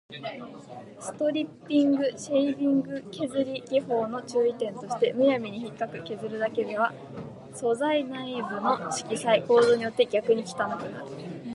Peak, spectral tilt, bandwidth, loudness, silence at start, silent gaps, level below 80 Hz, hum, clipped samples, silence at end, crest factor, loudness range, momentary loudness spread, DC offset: -8 dBFS; -5 dB/octave; 11.5 kHz; -27 LUFS; 0.1 s; none; -70 dBFS; none; under 0.1%; 0 s; 18 dB; 4 LU; 15 LU; under 0.1%